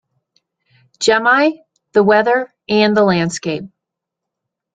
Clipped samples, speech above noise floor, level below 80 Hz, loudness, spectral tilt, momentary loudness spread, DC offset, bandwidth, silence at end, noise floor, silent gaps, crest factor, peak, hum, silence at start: under 0.1%; 67 dB; -56 dBFS; -15 LUFS; -4.5 dB/octave; 11 LU; under 0.1%; 9.4 kHz; 1.1 s; -81 dBFS; none; 16 dB; -2 dBFS; none; 1 s